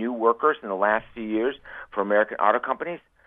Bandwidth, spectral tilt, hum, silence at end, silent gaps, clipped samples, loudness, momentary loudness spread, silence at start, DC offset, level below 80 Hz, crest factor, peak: 3.8 kHz; -8.5 dB/octave; none; 0.3 s; none; under 0.1%; -24 LUFS; 9 LU; 0 s; under 0.1%; -62 dBFS; 20 dB; -4 dBFS